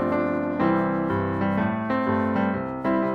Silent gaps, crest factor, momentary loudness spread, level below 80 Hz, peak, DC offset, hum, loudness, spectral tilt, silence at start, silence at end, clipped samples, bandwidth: none; 16 dB; 3 LU; -52 dBFS; -8 dBFS; under 0.1%; none; -24 LUFS; -9.5 dB/octave; 0 s; 0 s; under 0.1%; 5.8 kHz